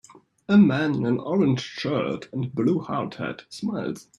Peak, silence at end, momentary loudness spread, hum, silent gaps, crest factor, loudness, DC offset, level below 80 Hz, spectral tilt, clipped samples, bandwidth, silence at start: -8 dBFS; 0.15 s; 13 LU; none; none; 16 dB; -24 LUFS; under 0.1%; -62 dBFS; -7 dB/octave; under 0.1%; 10.5 kHz; 0.5 s